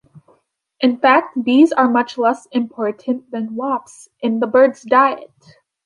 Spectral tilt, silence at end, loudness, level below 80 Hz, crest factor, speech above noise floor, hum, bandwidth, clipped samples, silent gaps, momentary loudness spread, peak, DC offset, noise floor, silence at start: -5 dB/octave; 0.6 s; -17 LUFS; -68 dBFS; 16 dB; 43 dB; none; 11 kHz; under 0.1%; none; 11 LU; -2 dBFS; under 0.1%; -59 dBFS; 0.8 s